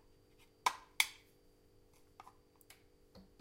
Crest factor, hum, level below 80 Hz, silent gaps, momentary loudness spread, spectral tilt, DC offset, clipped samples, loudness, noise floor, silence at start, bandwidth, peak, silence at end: 34 dB; none; -72 dBFS; none; 27 LU; 1 dB/octave; under 0.1%; under 0.1%; -38 LUFS; -68 dBFS; 0.65 s; 16 kHz; -12 dBFS; 0.2 s